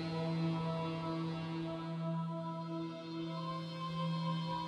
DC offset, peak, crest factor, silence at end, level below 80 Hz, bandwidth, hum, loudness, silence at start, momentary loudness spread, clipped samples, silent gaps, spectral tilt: under 0.1%; -26 dBFS; 12 dB; 0 s; -70 dBFS; 8.4 kHz; none; -40 LUFS; 0 s; 5 LU; under 0.1%; none; -7.5 dB/octave